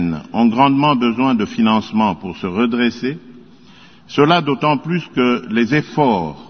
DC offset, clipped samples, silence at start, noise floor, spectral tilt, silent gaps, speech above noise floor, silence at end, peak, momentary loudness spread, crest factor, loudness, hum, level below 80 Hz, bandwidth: 0.3%; under 0.1%; 0 s; -45 dBFS; -7 dB/octave; none; 29 dB; 0.05 s; 0 dBFS; 9 LU; 16 dB; -16 LUFS; none; -52 dBFS; 6.6 kHz